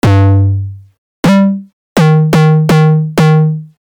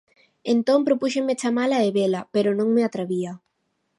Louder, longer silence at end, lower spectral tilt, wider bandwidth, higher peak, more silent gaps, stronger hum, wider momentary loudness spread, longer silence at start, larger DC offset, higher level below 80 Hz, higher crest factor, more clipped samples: first, -10 LUFS vs -22 LUFS; second, 0.25 s vs 0.6 s; first, -7.5 dB/octave vs -5.5 dB/octave; first, 14 kHz vs 11.5 kHz; about the same, -4 dBFS vs -6 dBFS; first, 0.98-1.23 s, 1.73-1.96 s vs none; neither; about the same, 10 LU vs 8 LU; second, 0.05 s vs 0.45 s; neither; first, -42 dBFS vs -74 dBFS; second, 4 dB vs 16 dB; neither